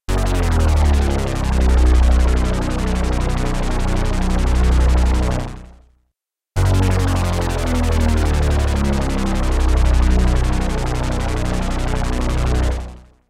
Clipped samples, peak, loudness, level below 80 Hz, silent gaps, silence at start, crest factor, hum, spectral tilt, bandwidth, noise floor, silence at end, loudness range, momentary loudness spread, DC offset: under 0.1%; -4 dBFS; -19 LUFS; -18 dBFS; none; 0.1 s; 12 dB; none; -6 dB/octave; 13 kHz; -74 dBFS; 0.3 s; 3 LU; 6 LU; under 0.1%